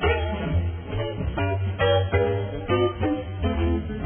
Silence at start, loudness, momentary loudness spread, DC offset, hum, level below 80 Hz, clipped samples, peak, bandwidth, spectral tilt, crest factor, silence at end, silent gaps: 0 s; -25 LUFS; 7 LU; under 0.1%; none; -34 dBFS; under 0.1%; -10 dBFS; 3.5 kHz; -11 dB/octave; 14 dB; 0 s; none